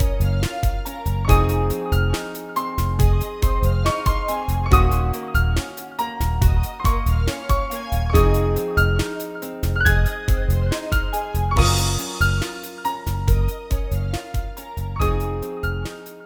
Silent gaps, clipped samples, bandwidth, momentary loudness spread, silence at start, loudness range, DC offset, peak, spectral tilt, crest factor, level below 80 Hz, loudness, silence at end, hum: none; under 0.1%; over 20 kHz; 10 LU; 0 s; 3 LU; under 0.1%; 0 dBFS; -5.5 dB/octave; 20 dB; -22 dBFS; -22 LUFS; 0 s; none